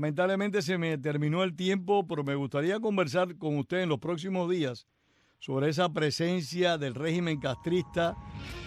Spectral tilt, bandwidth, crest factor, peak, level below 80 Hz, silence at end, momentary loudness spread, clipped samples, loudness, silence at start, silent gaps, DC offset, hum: -6 dB/octave; 14 kHz; 18 dB; -12 dBFS; -58 dBFS; 0 s; 4 LU; under 0.1%; -30 LUFS; 0 s; none; under 0.1%; none